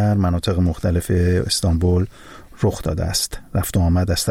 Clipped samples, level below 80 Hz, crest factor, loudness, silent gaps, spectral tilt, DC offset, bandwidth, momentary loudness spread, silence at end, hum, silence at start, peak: under 0.1%; -30 dBFS; 12 dB; -20 LUFS; none; -5.5 dB/octave; under 0.1%; 16.5 kHz; 5 LU; 0 s; none; 0 s; -6 dBFS